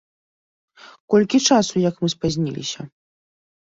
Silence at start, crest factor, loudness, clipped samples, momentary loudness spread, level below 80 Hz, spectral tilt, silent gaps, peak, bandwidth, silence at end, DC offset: 0.85 s; 18 dB; -19 LUFS; under 0.1%; 14 LU; -54 dBFS; -4.5 dB/octave; 1.00-1.08 s; -4 dBFS; 8 kHz; 0.9 s; under 0.1%